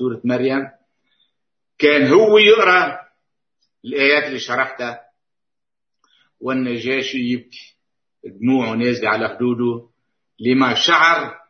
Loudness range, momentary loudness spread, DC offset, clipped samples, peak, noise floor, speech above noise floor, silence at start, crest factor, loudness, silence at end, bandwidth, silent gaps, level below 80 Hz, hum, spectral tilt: 10 LU; 16 LU; under 0.1%; under 0.1%; 0 dBFS; -87 dBFS; 71 dB; 0 s; 18 dB; -16 LUFS; 0.15 s; 6.6 kHz; none; -68 dBFS; none; -4.5 dB/octave